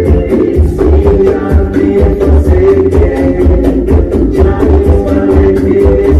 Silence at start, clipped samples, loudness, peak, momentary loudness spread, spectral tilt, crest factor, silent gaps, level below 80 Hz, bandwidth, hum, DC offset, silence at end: 0 s; under 0.1%; -8 LUFS; 0 dBFS; 3 LU; -9.5 dB/octave; 6 dB; none; -12 dBFS; 6 kHz; none; 0.4%; 0 s